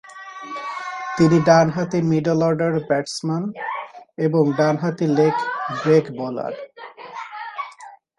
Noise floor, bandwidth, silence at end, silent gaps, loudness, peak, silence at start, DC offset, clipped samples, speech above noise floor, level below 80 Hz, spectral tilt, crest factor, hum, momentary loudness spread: -43 dBFS; 11 kHz; 0.25 s; none; -20 LUFS; -2 dBFS; 0.05 s; under 0.1%; under 0.1%; 24 dB; -60 dBFS; -6.5 dB/octave; 18 dB; none; 19 LU